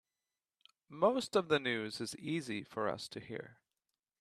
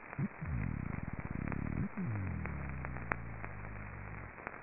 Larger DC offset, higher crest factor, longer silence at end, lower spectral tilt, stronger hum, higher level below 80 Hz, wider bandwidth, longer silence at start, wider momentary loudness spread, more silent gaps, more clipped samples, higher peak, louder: second, under 0.1% vs 0.3%; second, 22 dB vs 30 dB; first, 0.65 s vs 0 s; about the same, -4.5 dB/octave vs -5 dB/octave; neither; second, -78 dBFS vs -50 dBFS; first, 14 kHz vs 2.9 kHz; first, 0.9 s vs 0 s; first, 15 LU vs 8 LU; neither; neither; second, -16 dBFS vs -12 dBFS; first, -36 LUFS vs -42 LUFS